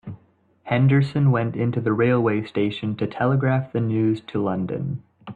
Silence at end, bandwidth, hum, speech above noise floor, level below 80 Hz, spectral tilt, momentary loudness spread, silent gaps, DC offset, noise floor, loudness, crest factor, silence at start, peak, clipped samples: 0 s; 4.7 kHz; none; 38 dB; -58 dBFS; -9.5 dB/octave; 8 LU; none; under 0.1%; -59 dBFS; -22 LUFS; 14 dB; 0.05 s; -8 dBFS; under 0.1%